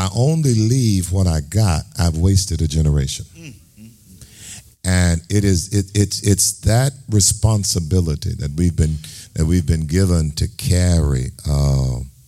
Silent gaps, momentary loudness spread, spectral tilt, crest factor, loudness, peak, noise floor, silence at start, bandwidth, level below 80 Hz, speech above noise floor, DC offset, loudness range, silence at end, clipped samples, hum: none; 8 LU; -5 dB/octave; 16 dB; -18 LUFS; -2 dBFS; -44 dBFS; 0 s; 15.5 kHz; -30 dBFS; 27 dB; under 0.1%; 4 LU; 0.15 s; under 0.1%; none